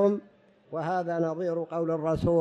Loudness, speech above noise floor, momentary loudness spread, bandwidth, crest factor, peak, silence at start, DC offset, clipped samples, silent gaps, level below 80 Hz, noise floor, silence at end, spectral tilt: -29 LUFS; 30 dB; 8 LU; 9.4 kHz; 14 dB; -12 dBFS; 0 s; under 0.1%; under 0.1%; none; -54 dBFS; -58 dBFS; 0 s; -8.5 dB/octave